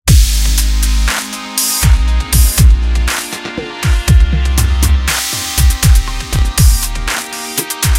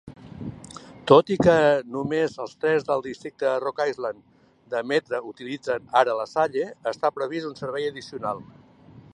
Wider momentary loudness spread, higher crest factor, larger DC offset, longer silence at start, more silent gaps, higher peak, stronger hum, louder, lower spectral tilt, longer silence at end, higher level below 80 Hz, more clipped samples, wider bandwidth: second, 8 LU vs 18 LU; second, 10 dB vs 22 dB; neither; about the same, 0.05 s vs 0.05 s; neither; about the same, 0 dBFS vs -2 dBFS; neither; first, -13 LUFS vs -24 LUFS; second, -3.5 dB/octave vs -6 dB/octave; second, 0 s vs 0.15 s; first, -12 dBFS vs -58 dBFS; neither; first, 17 kHz vs 11 kHz